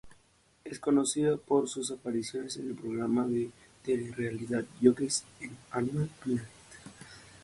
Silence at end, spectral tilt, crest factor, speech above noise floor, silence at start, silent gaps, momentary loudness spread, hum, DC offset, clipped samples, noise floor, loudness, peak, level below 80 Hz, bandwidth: 0.05 s; -5 dB/octave; 24 dB; 35 dB; 0.05 s; none; 22 LU; none; under 0.1%; under 0.1%; -66 dBFS; -32 LUFS; -10 dBFS; -66 dBFS; 11.5 kHz